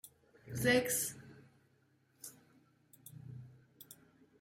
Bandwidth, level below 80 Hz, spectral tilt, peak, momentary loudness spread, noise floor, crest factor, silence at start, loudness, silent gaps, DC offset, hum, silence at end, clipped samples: 16.5 kHz; -70 dBFS; -3.5 dB/octave; -18 dBFS; 27 LU; -73 dBFS; 24 dB; 0.05 s; -34 LUFS; none; under 0.1%; none; 0.5 s; under 0.1%